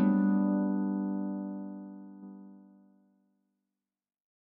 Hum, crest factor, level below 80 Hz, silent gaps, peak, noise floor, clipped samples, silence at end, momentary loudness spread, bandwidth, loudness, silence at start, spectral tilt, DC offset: none; 18 dB; under -90 dBFS; none; -16 dBFS; under -90 dBFS; under 0.1%; 1.85 s; 22 LU; 2.8 kHz; -31 LUFS; 0 s; -12.5 dB/octave; under 0.1%